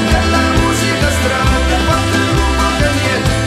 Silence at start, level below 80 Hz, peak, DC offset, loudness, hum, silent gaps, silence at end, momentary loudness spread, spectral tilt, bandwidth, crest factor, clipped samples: 0 s; -20 dBFS; 0 dBFS; under 0.1%; -13 LUFS; none; none; 0 s; 1 LU; -4.5 dB/octave; 14 kHz; 12 dB; under 0.1%